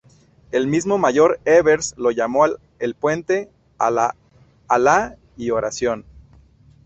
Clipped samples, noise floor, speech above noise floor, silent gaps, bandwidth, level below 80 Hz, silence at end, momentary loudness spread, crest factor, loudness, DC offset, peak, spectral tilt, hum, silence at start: under 0.1%; -50 dBFS; 32 dB; none; 8.4 kHz; -52 dBFS; 0.85 s; 11 LU; 18 dB; -19 LUFS; under 0.1%; -2 dBFS; -4.5 dB/octave; none; 0.55 s